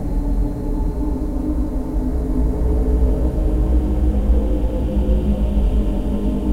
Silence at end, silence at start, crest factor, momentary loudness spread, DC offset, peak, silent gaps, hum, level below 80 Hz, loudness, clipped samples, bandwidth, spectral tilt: 0 s; 0 s; 12 dB; 5 LU; under 0.1%; -4 dBFS; none; none; -18 dBFS; -21 LUFS; under 0.1%; 3.9 kHz; -9.5 dB/octave